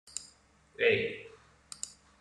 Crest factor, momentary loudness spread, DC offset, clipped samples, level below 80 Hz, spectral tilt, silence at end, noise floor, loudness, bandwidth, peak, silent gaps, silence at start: 22 dB; 21 LU; under 0.1%; under 0.1%; -70 dBFS; -2.5 dB/octave; 0.3 s; -63 dBFS; -32 LUFS; 12 kHz; -14 dBFS; none; 0.05 s